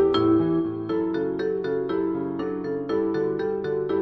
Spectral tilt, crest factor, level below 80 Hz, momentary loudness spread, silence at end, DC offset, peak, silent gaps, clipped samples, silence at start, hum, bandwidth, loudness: -8.5 dB/octave; 14 dB; -56 dBFS; 7 LU; 0 s; under 0.1%; -10 dBFS; none; under 0.1%; 0 s; none; 6 kHz; -25 LUFS